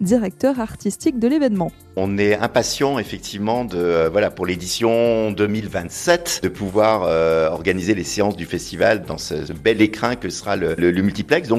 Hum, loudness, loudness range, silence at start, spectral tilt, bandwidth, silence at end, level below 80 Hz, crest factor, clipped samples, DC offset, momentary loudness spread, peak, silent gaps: none; -19 LUFS; 1 LU; 0 s; -5 dB/octave; 14 kHz; 0 s; -46 dBFS; 16 dB; under 0.1%; under 0.1%; 8 LU; -4 dBFS; none